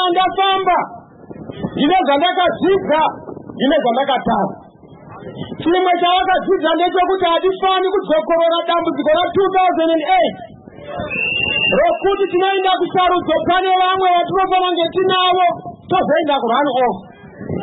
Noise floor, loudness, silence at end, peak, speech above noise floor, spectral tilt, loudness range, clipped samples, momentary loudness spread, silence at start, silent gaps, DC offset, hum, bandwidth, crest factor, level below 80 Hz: -40 dBFS; -15 LUFS; 0 s; -4 dBFS; 25 dB; -10 dB/octave; 2 LU; under 0.1%; 13 LU; 0 s; none; under 0.1%; none; 4.1 kHz; 12 dB; -48 dBFS